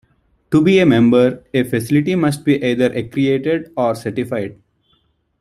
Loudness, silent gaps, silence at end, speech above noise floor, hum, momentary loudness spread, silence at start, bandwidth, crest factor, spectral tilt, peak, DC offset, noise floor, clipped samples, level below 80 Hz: -16 LUFS; none; 0.85 s; 46 dB; none; 10 LU; 0.5 s; 14.5 kHz; 14 dB; -7 dB/octave; -2 dBFS; under 0.1%; -62 dBFS; under 0.1%; -52 dBFS